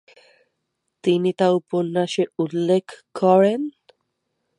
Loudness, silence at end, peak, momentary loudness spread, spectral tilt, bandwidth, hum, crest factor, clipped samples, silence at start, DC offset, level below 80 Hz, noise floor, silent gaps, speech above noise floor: -20 LUFS; 0.9 s; -4 dBFS; 10 LU; -6.5 dB/octave; 11 kHz; none; 18 dB; under 0.1%; 1.05 s; under 0.1%; -72 dBFS; -76 dBFS; none; 57 dB